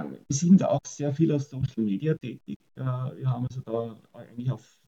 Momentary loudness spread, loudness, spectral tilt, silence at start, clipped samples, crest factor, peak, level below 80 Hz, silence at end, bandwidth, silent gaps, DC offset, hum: 18 LU; -27 LUFS; -7 dB/octave; 0 s; under 0.1%; 18 dB; -8 dBFS; -60 dBFS; 0.3 s; 8 kHz; 2.56-2.60 s; under 0.1%; none